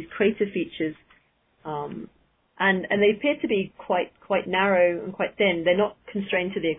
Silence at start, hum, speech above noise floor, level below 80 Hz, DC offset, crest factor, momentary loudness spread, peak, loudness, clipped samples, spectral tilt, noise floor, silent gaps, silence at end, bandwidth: 0 s; none; 40 dB; -60 dBFS; under 0.1%; 18 dB; 12 LU; -8 dBFS; -24 LUFS; under 0.1%; -9.5 dB/octave; -64 dBFS; none; 0 s; 3.9 kHz